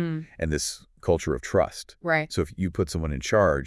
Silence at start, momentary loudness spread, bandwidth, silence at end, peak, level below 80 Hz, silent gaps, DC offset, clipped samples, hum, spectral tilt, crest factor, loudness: 0 s; 7 LU; 12 kHz; 0 s; -8 dBFS; -42 dBFS; none; under 0.1%; under 0.1%; none; -5 dB/octave; 18 dB; -27 LUFS